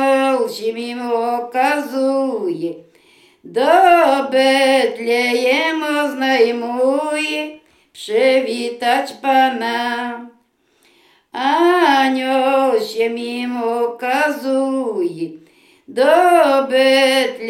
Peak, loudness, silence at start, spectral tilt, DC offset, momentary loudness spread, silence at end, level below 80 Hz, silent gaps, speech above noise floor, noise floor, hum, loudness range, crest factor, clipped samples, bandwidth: 0 dBFS; -16 LUFS; 0 s; -3 dB/octave; under 0.1%; 11 LU; 0 s; -70 dBFS; none; 42 dB; -58 dBFS; none; 5 LU; 16 dB; under 0.1%; 17 kHz